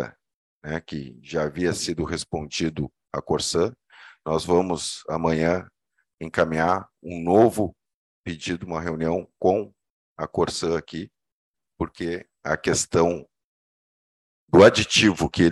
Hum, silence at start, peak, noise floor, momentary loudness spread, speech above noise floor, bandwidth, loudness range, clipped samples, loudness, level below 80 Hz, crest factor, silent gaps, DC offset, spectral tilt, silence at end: none; 0 s; 0 dBFS; under -90 dBFS; 17 LU; over 67 dB; 12.5 kHz; 6 LU; under 0.1%; -23 LUFS; -50 dBFS; 24 dB; 0.34-0.61 s, 6.14-6.18 s, 7.94-8.24 s, 9.90-10.16 s, 11.32-11.54 s, 13.44-14.48 s; under 0.1%; -4.5 dB/octave; 0 s